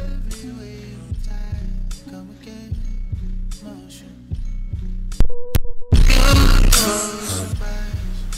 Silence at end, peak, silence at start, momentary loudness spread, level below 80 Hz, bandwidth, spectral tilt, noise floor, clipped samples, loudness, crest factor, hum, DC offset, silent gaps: 0 s; -2 dBFS; 0 s; 21 LU; -20 dBFS; 16 kHz; -4 dB/octave; -39 dBFS; under 0.1%; -21 LUFS; 16 dB; none; under 0.1%; none